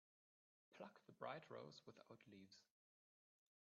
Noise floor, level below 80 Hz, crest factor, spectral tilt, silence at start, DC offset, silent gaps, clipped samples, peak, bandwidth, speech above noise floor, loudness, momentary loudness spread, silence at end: under -90 dBFS; under -90 dBFS; 24 dB; -3.5 dB/octave; 0.7 s; under 0.1%; none; under 0.1%; -38 dBFS; 7.2 kHz; over 31 dB; -60 LUFS; 11 LU; 1.05 s